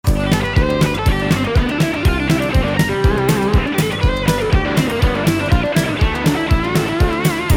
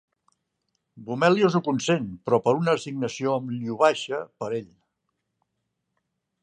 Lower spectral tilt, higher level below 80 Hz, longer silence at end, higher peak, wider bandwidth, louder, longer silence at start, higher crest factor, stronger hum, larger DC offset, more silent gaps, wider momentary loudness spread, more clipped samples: about the same, -6 dB/octave vs -5.5 dB/octave; first, -22 dBFS vs -68 dBFS; second, 0 s vs 1.75 s; first, -2 dBFS vs -6 dBFS; first, 18.5 kHz vs 9.8 kHz; first, -16 LUFS vs -24 LUFS; second, 0.05 s vs 0.95 s; second, 12 dB vs 20 dB; neither; first, 0.2% vs under 0.1%; neither; second, 2 LU vs 11 LU; neither